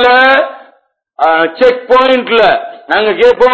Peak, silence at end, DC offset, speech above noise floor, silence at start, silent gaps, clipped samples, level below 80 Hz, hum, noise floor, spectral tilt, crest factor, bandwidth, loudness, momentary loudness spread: 0 dBFS; 0 s; under 0.1%; 42 dB; 0 s; none; 1%; -46 dBFS; none; -51 dBFS; -4.5 dB/octave; 10 dB; 8 kHz; -9 LUFS; 7 LU